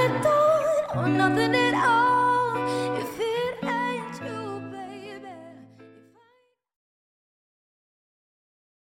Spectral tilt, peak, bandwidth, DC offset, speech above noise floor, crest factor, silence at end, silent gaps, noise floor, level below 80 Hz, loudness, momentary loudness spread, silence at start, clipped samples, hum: -5.5 dB/octave; -8 dBFS; 16.5 kHz; under 0.1%; 44 dB; 18 dB; 2.95 s; none; -66 dBFS; -66 dBFS; -24 LUFS; 18 LU; 0 s; under 0.1%; none